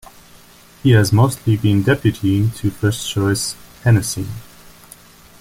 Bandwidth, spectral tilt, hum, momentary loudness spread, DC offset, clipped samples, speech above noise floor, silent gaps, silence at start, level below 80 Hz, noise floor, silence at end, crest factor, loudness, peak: 16 kHz; -6 dB/octave; none; 10 LU; under 0.1%; under 0.1%; 29 dB; none; 0.85 s; -44 dBFS; -45 dBFS; 1 s; 16 dB; -17 LUFS; -2 dBFS